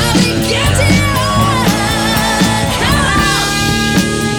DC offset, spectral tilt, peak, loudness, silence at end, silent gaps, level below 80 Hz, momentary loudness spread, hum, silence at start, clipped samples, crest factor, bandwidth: under 0.1%; -4 dB/octave; 0 dBFS; -12 LUFS; 0 s; none; -24 dBFS; 2 LU; none; 0 s; under 0.1%; 12 dB; over 20 kHz